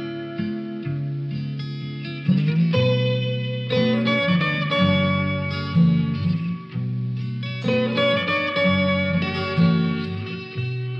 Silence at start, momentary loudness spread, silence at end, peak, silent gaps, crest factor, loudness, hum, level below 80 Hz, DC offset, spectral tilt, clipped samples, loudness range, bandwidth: 0 s; 10 LU; 0 s; -8 dBFS; none; 14 dB; -22 LUFS; none; -58 dBFS; under 0.1%; -8 dB/octave; under 0.1%; 3 LU; 6 kHz